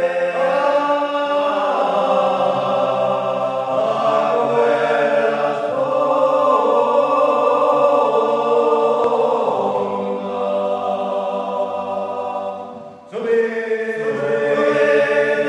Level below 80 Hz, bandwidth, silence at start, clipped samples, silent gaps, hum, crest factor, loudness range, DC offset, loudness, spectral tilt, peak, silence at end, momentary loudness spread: -74 dBFS; 9.8 kHz; 0 s; under 0.1%; none; none; 14 dB; 7 LU; under 0.1%; -18 LUFS; -5.5 dB/octave; -2 dBFS; 0 s; 8 LU